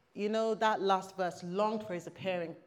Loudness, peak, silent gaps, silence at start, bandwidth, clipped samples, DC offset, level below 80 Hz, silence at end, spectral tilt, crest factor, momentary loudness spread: -34 LUFS; -14 dBFS; none; 0.15 s; 15 kHz; under 0.1%; under 0.1%; -82 dBFS; 0.1 s; -5 dB/octave; 18 dB; 8 LU